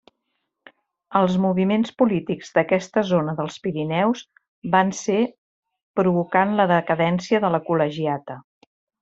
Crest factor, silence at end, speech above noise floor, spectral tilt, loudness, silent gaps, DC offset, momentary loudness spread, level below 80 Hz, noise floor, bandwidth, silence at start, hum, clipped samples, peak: 20 dB; 0.6 s; 56 dB; -6.5 dB/octave; -21 LUFS; 4.48-4.62 s, 5.38-5.63 s, 5.83-5.94 s; under 0.1%; 8 LU; -62 dBFS; -76 dBFS; 8 kHz; 1.1 s; none; under 0.1%; -2 dBFS